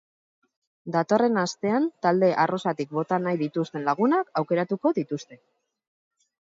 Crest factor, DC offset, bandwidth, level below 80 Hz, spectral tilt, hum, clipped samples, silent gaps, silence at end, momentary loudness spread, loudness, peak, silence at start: 18 dB; under 0.1%; 7.8 kHz; -76 dBFS; -6.5 dB/octave; none; under 0.1%; none; 1.1 s; 7 LU; -25 LUFS; -8 dBFS; 0.85 s